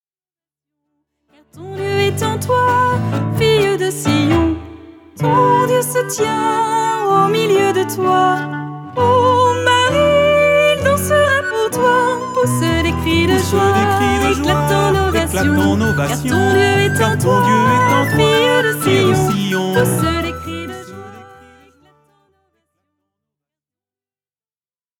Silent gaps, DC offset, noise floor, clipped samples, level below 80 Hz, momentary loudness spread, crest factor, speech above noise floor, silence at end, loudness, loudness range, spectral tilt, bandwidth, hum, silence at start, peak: none; under 0.1%; under -90 dBFS; under 0.1%; -38 dBFS; 7 LU; 14 dB; over 76 dB; 3.75 s; -14 LUFS; 5 LU; -5 dB/octave; 18.5 kHz; none; 1.55 s; -2 dBFS